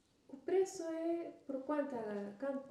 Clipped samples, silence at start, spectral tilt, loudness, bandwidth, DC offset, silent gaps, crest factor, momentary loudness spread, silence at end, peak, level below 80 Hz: under 0.1%; 0.3 s; -5.5 dB/octave; -40 LUFS; 12.5 kHz; under 0.1%; none; 14 dB; 9 LU; 0 s; -26 dBFS; -84 dBFS